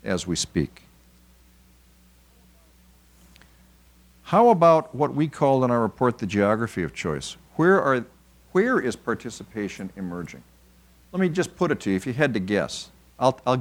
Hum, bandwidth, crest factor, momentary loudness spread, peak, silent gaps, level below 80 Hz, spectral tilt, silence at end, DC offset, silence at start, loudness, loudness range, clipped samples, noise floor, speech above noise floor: none; over 20 kHz; 20 dB; 15 LU; -4 dBFS; none; -54 dBFS; -5.5 dB/octave; 0 s; under 0.1%; 0.05 s; -23 LUFS; 8 LU; under 0.1%; -55 dBFS; 33 dB